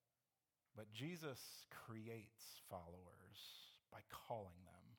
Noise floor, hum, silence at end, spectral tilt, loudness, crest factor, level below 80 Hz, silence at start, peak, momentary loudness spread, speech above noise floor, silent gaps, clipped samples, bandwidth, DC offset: under -90 dBFS; none; 0 s; -4.5 dB/octave; -56 LUFS; 22 dB; -84 dBFS; 0.75 s; -36 dBFS; 11 LU; over 34 dB; none; under 0.1%; 19 kHz; under 0.1%